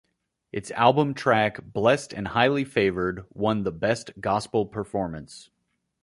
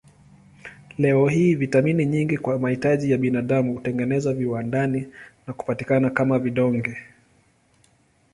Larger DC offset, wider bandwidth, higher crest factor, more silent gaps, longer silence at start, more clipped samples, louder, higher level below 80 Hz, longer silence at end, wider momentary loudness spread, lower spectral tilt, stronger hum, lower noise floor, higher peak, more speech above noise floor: neither; about the same, 11.5 kHz vs 11 kHz; about the same, 22 dB vs 18 dB; neither; about the same, 0.55 s vs 0.65 s; neither; second, -25 LUFS vs -22 LUFS; about the same, -54 dBFS vs -58 dBFS; second, 0.6 s vs 1.3 s; second, 12 LU vs 19 LU; second, -5.5 dB/octave vs -8 dB/octave; neither; second, -54 dBFS vs -61 dBFS; about the same, -4 dBFS vs -4 dBFS; second, 30 dB vs 39 dB